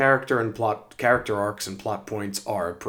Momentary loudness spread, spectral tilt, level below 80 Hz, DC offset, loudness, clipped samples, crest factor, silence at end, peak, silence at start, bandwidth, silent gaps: 9 LU; -4.5 dB/octave; -58 dBFS; under 0.1%; -25 LUFS; under 0.1%; 20 dB; 0 s; -6 dBFS; 0 s; over 20 kHz; none